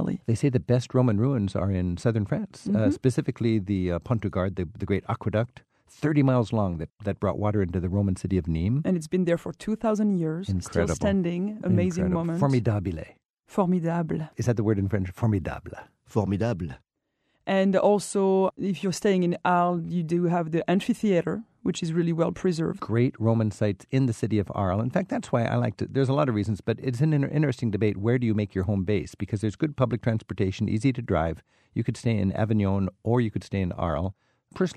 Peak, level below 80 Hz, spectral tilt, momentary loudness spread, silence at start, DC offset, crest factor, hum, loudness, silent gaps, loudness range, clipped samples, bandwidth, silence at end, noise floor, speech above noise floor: -8 dBFS; -50 dBFS; -7.5 dB/octave; 7 LU; 0 s; under 0.1%; 18 dB; none; -26 LUFS; 13.30-13.34 s; 3 LU; under 0.1%; 12.5 kHz; 0.05 s; -76 dBFS; 51 dB